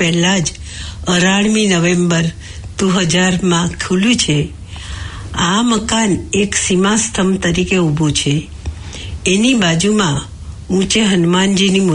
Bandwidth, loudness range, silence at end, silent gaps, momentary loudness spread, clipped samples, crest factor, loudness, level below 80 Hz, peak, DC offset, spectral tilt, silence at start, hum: 11 kHz; 2 LU; 0 s; none; 15 LU; under 0.1%; 12 dB; -14 LUFS; -34 dBFS; -2 dBFS; under 0.1%; -4 dB/octave; 0 s; none